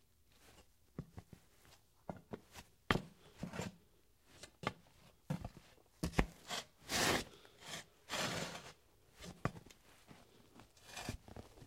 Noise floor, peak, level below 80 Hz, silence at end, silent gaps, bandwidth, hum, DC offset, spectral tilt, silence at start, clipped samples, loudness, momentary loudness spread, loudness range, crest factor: -71 dBFS; -10 dBFS; -58 dBFS; 0 s; none; 16 kHz; none; under 0.1%; -3.5 dB/octave; 0.45 s; under 0.1%; -43 LUFS; 24 LU; 7 LU; 36 dB